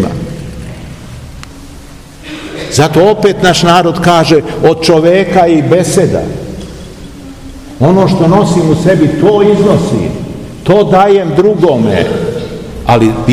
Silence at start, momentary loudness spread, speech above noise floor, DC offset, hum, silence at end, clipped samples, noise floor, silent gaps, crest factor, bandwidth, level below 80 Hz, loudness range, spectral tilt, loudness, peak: 0 s; 21 LU; 23 dB; 0.6%; none; 0 s; 3%; -30 dBFS; none; 10 dB; 15.5 kHz; -32 dBFS; 3 LU; -6 dB/octave; -8 LUFS; 0 dBFS